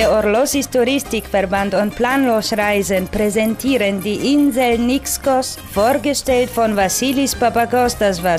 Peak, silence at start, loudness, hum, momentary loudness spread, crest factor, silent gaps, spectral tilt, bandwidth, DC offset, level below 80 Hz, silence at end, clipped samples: -4 dBFS; 0 s; -16 LUFS; none; 4 LU; 12 dB; none; -4 dB/octave; 16 kHz; under 0.1%; -38 dBFS; 0 s; under 0.1%